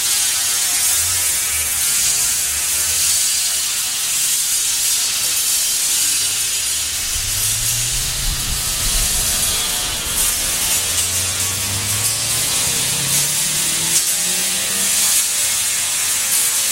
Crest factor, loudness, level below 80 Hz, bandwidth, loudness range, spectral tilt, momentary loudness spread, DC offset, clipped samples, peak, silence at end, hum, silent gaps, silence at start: 16 dB; -15 LUFS; -36 dBFS; 16 kHz; 2 LU; 0.5 dB/octave; 4 LU; 0.1%; under 0.1%; -2 dBFS; 0 s; none; none; 0 s